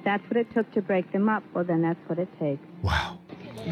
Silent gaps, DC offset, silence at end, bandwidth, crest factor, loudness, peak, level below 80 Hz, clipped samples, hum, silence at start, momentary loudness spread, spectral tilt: none; under 0.1%; 0 s; 13.5 kHz; 14 dB; -28 LUFS; -12 dBFS; -48 dBFS; under 0.1%; none; 0 s; 9 LU; -7 dB/octave